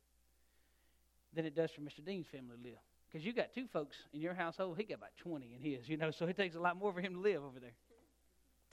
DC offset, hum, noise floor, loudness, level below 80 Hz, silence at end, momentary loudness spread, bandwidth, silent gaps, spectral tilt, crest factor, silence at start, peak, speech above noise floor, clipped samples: under 0.1%; none; -74 dBFS; -42 LUFS; -78 dBFS; 0.8 s; 15 LU; 14 kHz; none; -6.5 dB/octave; 22 dB; 1.35 s; -22 dBFS; 32 dB; under 0.1%